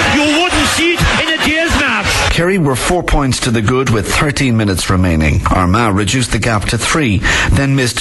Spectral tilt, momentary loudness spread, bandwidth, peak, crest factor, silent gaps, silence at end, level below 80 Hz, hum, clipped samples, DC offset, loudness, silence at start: -4.5 dB/octave; 3 LU; 12.5 kHz; -2 dBFS; 12 dB; none; 0 s; -24 dBFS; none; under 0.1%; under 0.1%; -12 LUFS; 0 s